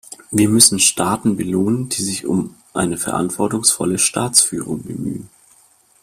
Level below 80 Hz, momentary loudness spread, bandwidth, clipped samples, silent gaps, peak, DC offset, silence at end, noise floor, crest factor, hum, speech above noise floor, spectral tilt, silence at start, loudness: -52 dBFS; 15 LU; 16 kHz; under 0.1%; none; 0 dBFS; under 0.1%; 0.75 s; -53 dBFS; 18 dB; none; 36 dB; -3 dB/octave; 0.1 s; -16 LUFS